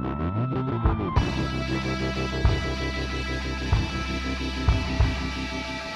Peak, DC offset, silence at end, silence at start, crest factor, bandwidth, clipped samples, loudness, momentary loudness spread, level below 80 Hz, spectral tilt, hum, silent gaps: -8 dBFS; under 0.1%; 0 s; 0 s; 18 dB; 11 kHz; under 0.1%; -27 LUFS; 4 LU; -30 dBFS; -6 dB/octave; none; none